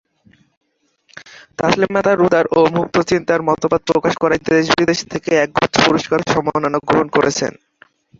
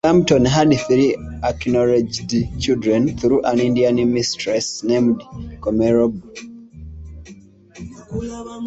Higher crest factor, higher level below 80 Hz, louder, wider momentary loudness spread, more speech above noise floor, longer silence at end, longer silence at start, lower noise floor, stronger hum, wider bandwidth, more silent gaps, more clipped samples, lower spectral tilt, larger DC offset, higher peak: about the same, 16 dB vs 16 dB; second, -48 dBFS vs -40 dBFS; about the same, -16 LUFS vs -18 LUFS; second, 5 LU vs 22 LU; first, 43 dB vs 26 dB; first, 0.7 s vs 0 s; first, 1.15 s vs 0.05 s; first, -59 dBFS vs -43 dBFS; neither; about the same, 7.8 kHz vs 8.2 kHz; neither; neither; about the same, -4.5 dB/octave vs -5.5 dB/octave; neither; about the same, 0 dBFS vs -2 dBFS